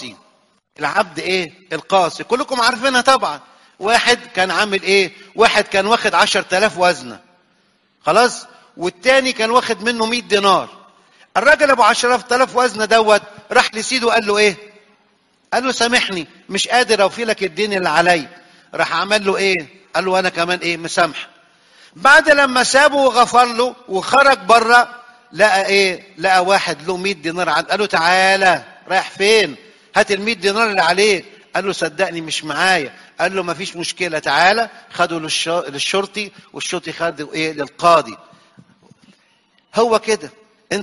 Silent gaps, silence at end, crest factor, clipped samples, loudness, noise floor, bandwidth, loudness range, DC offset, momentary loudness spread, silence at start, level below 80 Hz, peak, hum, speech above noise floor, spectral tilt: none; 0 s; 16 dB; under 0.1%; -15 LUFS; -59 dBFS; 11.5 kHz; 5 LU; under 0.1%; 11 LU; 0 s; -56 dBFS; 0 dBFS; none; 44 dB; -2.5 dB/octave